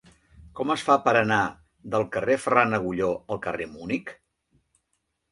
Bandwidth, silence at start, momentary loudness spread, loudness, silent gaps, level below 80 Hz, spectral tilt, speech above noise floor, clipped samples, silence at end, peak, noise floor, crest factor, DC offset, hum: 11.5 kHz; 0.4 s; 11 LU; -25 LUFS; none; -58 dBFS; -5.5 dB/octave; 52 dB; under 0.1%; 1.2 s; -2 dBFS; -76 dBFS; 24 dB; under 0.1%; none